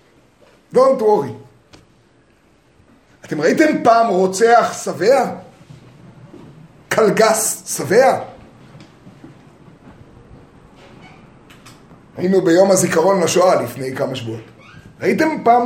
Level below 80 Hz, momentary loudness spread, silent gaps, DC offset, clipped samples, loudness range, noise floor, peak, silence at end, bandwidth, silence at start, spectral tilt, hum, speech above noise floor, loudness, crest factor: -58 dBFS; 14 LU; none; under 0.1%; under 0.1%; 5 LU; -54 dBFS; 0 dBFS; 0 s; 16.5 kHz; 0.75 s; -4.5 dB/octave; none; 39 dB; -15 LUFS; 18 dB